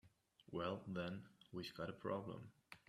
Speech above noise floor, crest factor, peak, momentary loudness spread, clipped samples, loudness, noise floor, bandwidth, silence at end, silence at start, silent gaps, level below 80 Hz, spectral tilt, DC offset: 23 dB; 18 dB; -32 dBFS; 9 LU; under 0.1%; -49 LUFS; -71 dBFS; 13.5 kHz; 0.1 s; 0.05 s; none; -78 dBFS; -6.5 dB/octave; under 0.1%